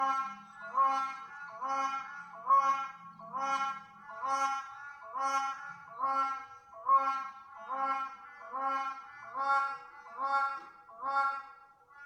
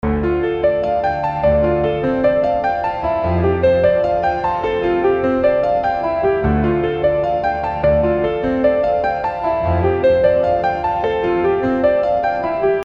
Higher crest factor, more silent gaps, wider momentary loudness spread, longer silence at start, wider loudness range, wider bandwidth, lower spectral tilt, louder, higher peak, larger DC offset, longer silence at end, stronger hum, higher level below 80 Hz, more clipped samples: about the same, 18 dB vs 14 dB; neither; first, 17 LU vs 4 LU; about the same, 0 s vs 0.05 s; about the same, 3 LU vs 1 LU; first, 11.5 kHz vs 6.2 kHz; second, -2 dB/octave vs -9 dB/octave; second, -33 LUFS vs -17 LUFS; second, -16 dBFS vs -2 dBFS; neither; about the same, 0 s vs 0 s; neither; second, -84 dBFS vs -32 dBFS; neither